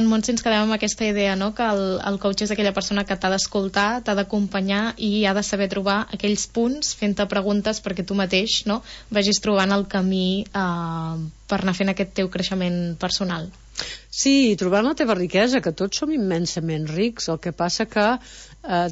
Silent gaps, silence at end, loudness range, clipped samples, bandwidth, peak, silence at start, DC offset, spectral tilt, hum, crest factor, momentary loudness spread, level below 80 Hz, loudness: none; 0 s; 3 LU; under 0.1%; 8 kHz; -6 dBFS; 0 s; under 0.1%; -4.5 dB/octave; none; 16 dB; 7 LU; -48 dBFS; -22 LUFS